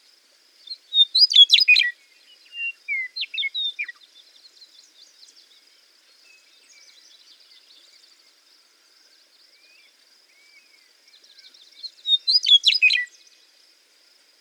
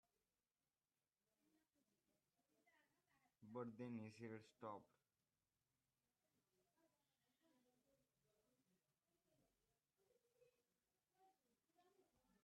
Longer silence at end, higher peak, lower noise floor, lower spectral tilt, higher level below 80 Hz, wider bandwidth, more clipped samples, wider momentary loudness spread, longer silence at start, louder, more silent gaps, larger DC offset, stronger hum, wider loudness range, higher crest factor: first, 1.35 s vs 0.4 s; first, -2 dBFS vs -40 dBFS; second, -58 dBFS vs under -90 dBFS; second, 7.5 dB/octave vs -6.5 dB/octave; about the same, under -90 dBFS vs under -90 dBFS; first, 16.5 kHz vs 5.8 kHz; neither; first, 24 LU vs 5 LU; second, 0.7 s vs 2.65 s; first, -16 LUFS vs -57 LUFS; neither; neither; neither; first, 15 LU vs 6 LU; about the same, 24 dB vs 24 dB